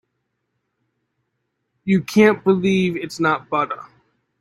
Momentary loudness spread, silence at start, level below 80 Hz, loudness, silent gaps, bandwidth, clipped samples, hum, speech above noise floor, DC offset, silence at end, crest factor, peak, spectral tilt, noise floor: 11 LU; 1.85 s; -60 dBFS; -18 LUFS; none; 13.5 kHz; under 0.1%; none; 57 dB; under 0.1%; 0.55 s; 20 dB; -2 dBFS; -6.5 dB/octave; -74 dBFS